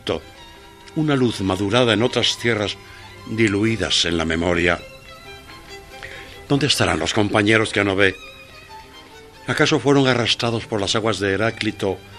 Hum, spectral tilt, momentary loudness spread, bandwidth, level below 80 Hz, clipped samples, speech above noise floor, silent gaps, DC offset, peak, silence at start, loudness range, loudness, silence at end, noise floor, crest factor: none; -4.5 dB/octave; 22 LU; 14 kHz; -46 dBFS; under 0.1%; 23 dB; none; under 0.1%; 0 dBFS; 0.05 s; 2 LU; -19 LUFS; 0 s; -42 dBFS; 20 dB